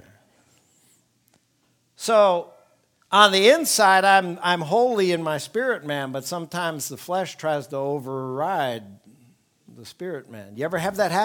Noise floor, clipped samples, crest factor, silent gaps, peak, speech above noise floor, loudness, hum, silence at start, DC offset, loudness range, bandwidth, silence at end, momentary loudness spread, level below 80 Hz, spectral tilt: -67 dBFS; under 0.1%; 22 dB; none; 0 dBFS; 45 dB; -21 LUFS; none; 2 s; under 0.1%; 11 LU; 19.5 kHz; 0 s; 15 LU; -72 dBFS; -3 dB/octave